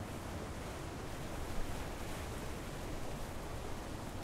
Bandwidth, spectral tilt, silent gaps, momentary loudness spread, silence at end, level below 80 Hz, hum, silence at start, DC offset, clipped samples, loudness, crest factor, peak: 16 kHz; -5 dB/octave; none; 1 LU; 0 s; -48 dBFS; none; 0 s; under 0.1%; under 0.1%; -44 LUFS; 16 dB; -26 dBFS